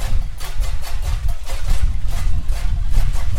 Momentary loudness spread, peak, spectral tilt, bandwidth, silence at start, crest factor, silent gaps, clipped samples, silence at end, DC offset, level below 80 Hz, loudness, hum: 4 LU; -2 dBFS; -4.5 dB/octave; 13.5 kHz; 0 s; 12 dB; none; under 0.1%; 0 s; under 0.1%; -18 dBFS; -25 LUFS; none